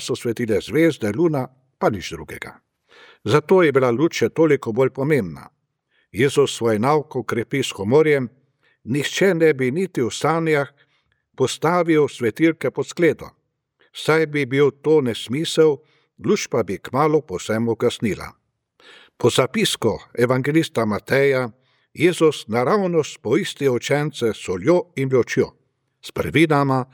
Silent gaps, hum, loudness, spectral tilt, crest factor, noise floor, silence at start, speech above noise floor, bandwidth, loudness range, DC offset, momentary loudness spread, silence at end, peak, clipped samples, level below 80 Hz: none; none; -20 LUFS; -5.5 dB/octave; 18 dB; -67 dBFS; 0 s; 48 dB; 17.5 kHz; 2 LU; under 0.1%; 10 LU; 0.1 s; -2 dBFS; under 0.1%; -56 dBFS